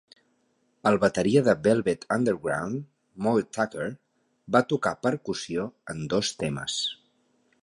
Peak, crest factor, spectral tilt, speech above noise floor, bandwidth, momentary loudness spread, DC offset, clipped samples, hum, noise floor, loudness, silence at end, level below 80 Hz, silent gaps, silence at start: -6 dBFS; 20 dB; -5 dB/octave; 44 dB; 11.5 kHz; 12 LU; under 0.1%; under 0.1%; none; -70 dBFS; -26 LUFS; 0.7 s; -60 dBFS; none; 0.85 s